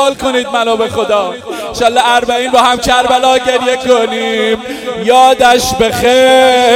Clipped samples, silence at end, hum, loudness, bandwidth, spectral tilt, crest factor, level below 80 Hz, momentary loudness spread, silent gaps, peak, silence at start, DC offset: 1%; 0 s; none; -10 LUFS; 17 kHz; -2.5 dB/octave; 10 dB; -38 dBFS; 8 LU; none; 0 dBFS; 0 s; under 0.1%